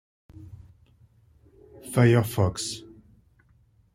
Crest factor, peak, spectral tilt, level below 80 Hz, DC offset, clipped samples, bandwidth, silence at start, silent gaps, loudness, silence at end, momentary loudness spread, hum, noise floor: 22 dB; -6 dBFS; -6 dB/octave; -56 dBFS; under 0.1%; under 0.1%; 15 kHz; 0.4 s; none; -24 LUFS; 1.15 s; 27 LU; none; -61 dBFS